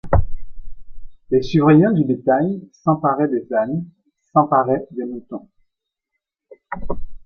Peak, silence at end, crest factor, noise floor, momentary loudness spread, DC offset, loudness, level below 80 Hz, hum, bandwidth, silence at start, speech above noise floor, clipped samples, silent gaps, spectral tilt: -2 dBFS; 0.1 s; 16 dB; -79 dBFS; 19 LU; under 0.1%; -18 LUFS; -34 dBFS; none; 6.6 kHz; 0.05 s; 62 dB; under 0.1%; none; -9.5 dB/octave